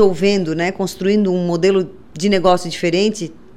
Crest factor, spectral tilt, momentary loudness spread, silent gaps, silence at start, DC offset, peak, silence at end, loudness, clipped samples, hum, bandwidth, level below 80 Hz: 14 dB; -5.5 dB/octave; 6 LU; none; 0 s; under 0.1%; -2 dBFS; 0 s; -17 LUFS; under 0.1%; none; 14 kHz; -46 dBFS